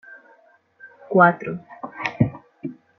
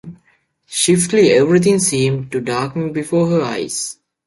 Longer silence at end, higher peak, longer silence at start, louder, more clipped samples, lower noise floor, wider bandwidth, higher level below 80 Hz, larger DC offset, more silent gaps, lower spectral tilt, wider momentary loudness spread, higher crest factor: about the same, 0.25 s vs 0.35 s; about the same, -2 dBFS vs -2 dBFS; about the same, 0.1 s vs 0.05 s; second, -20 LUFS vs -16 LUFS; neither; about the same, -56 dBFS vs -58 dBFS; second, 6.2 kHz vs 11.5 kHz; about the same, -56 dBFS vs -54 dBFS; neither; neither; first, -8.5 dB/octave vs -4.5 dB/octave; first, 20 LU vs 10 LU; first, 22 dB vs 14 dB